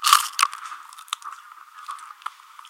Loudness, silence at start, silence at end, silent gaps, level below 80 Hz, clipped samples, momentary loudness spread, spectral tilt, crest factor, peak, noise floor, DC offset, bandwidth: -23 LUFS; 0 s; 0.4 s; none; -88 dBFS; under 0.1%; 23 LU; 7 dB/octave; 26 dB; 0 dBFS; -44 dBFS; under 0.1%; 17 kHz